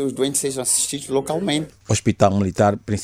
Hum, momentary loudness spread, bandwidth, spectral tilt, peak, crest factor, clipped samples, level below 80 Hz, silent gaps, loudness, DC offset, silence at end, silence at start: none; 5 LU; 16.5 kHz; -4.5 dB/octave; -2 dBFS; 18 dB; under 0.1%; -50 dBFS; none; -20 LUFS; under 0.1%; 0 s; 0 s